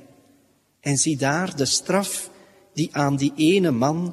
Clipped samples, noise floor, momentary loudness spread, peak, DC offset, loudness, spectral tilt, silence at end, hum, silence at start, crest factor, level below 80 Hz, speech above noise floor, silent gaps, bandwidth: under 0.1%; -61 dBFS; 11 LU; -6 dBFS; under 0.1%; -22 LUFS; -4 dB/octave; 0 s; none; 0.85 s; 18 dB; -62 dBFS; 40 dB; none; 14 kHz